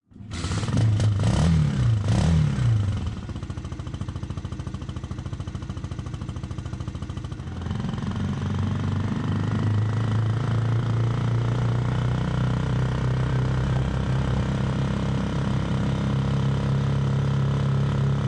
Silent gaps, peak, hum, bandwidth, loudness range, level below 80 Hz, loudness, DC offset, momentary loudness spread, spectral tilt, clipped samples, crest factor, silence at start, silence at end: none; -8 dBFS; none; 10.5 kHz; 10 LU; -36 dBFS; -25 LUFS; under 0.1%; 12 LU; -7.5 dB/octave; under 0.1%; 16 dB; 0.15 s; 0 s